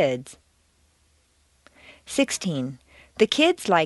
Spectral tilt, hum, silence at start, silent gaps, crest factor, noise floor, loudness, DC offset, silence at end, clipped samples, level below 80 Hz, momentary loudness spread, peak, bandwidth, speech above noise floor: -4 dB/octave; none; 0 s; none; 22 dB; -64 dBFS; -23 LUFS; under 0.1%; 0 s; under 0.1%; -62 dBFS; 23 LU; -4 dBFS; 11.5 kHz; 41 dB